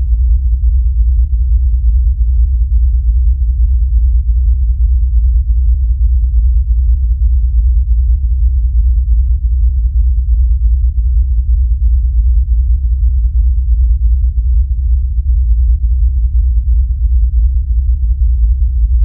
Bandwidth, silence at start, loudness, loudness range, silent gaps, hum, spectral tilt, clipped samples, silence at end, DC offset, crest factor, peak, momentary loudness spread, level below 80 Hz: 0.3 kHz; 0 s; -14 LUFS; 1 LU; none; none; -14 dB/octave; under 0.1%; 0 s; under 0.1%; 8 dB; -2 dBFS; 1 LU; -10 dBFS